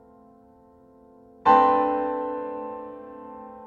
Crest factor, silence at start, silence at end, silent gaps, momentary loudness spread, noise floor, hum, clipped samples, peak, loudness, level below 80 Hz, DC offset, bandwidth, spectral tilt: 20 dB; 1.45 s; 0 s; none; 23 LU; -54 dBFS; none; under 0.1%; -6 dBFS; -22 LUFS; -62 dBFS; under 0.1%; 7 kHz; -6.5 dB/octave